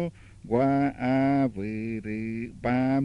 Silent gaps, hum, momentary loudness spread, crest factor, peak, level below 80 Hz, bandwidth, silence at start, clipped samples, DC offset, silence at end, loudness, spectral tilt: none; none; 9 LU; 14 dB; -12 dBFS; -52 dBFS; 5.8 kHz; 0 s; under 0.1%; under 0.1%; 0 s; -27 LUFS; -9 dB/octave